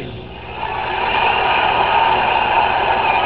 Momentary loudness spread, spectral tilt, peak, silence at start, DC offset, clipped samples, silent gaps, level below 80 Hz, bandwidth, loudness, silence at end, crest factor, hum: 13 LU; -7 dB/octave; -2 dBFS; 0 s; 0.6%; under 0.1%; none; -40 dBFS; 5.6 kHz; -15 LUFS; 0 s; 14 dB; 60 Hz at -40 dBFS